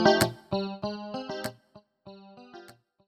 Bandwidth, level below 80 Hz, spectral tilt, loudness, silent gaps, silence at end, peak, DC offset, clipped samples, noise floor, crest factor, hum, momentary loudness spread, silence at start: 16 kHz; -58 dBFS; -4.5 dB/octave; -30 LUFS; none; 0.35 s; -8 dBFS; under 0.1%; under 0.1%; -58 dBFS; 24 dB; none; 24 LU; 0 s